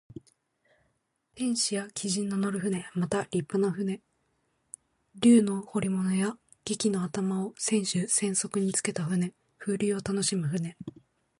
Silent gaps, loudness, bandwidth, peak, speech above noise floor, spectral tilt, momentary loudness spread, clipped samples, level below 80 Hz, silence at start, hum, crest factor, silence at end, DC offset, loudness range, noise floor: none; -28 LUFS; 11.5 kHz; -10 dBFS; 47 dB; -4.5 dB/octave; 12 LU; under 0.1%; -66 dBFS; 0.15 s; none; 20 dB; 0.5 s; under 0.1%; 4 LU; -75 dBFS